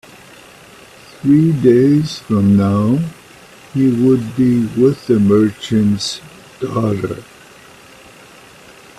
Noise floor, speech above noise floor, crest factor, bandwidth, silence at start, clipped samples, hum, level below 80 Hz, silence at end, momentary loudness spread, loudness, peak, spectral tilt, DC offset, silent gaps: -41 dBFS; 28 dB; 16 dB; 13.5 kHz; 1.25 s; under 0.1%; none; -50 dBFS; 1.75 s; 12 LU; -14 LUFS; 0 dBFS; -7.5 dB/octave; under 0.1%; none